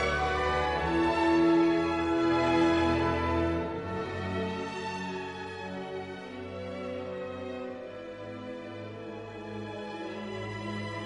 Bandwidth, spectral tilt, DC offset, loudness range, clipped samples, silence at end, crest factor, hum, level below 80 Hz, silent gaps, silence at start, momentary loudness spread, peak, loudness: 10 kHz; -6.5 dB/octave; under 0.1%; 13 LU; under 0.1%; 0 s; 14 dB; none; -48 dBFS; none; 0 s; 16 LU; -16 dBFS; -30 LUFS